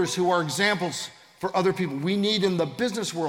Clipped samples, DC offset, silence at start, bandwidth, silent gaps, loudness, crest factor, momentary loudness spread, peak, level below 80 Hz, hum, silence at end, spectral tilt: under 0.1%; under 0.1%; 0 s; 17.5 kHz; none; -25 LUFS; 16 dB; 8 LU; -8 dBFS; -68 dBFS; none; 0 s; -4.5 dB/octave